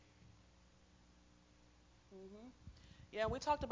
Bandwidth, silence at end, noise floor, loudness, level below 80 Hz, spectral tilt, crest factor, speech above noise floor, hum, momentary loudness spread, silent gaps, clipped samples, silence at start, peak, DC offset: 7.6 kHz; 0 s; -68 dBFS; -43 LUFS; -62 dBFS; -5 dB/octave; 22 dB; 26 dB; 60 Hz at -70 dBFS; 29 LU; none; under 0.1%; 0.25 s; -24 dBFS; under 0.1%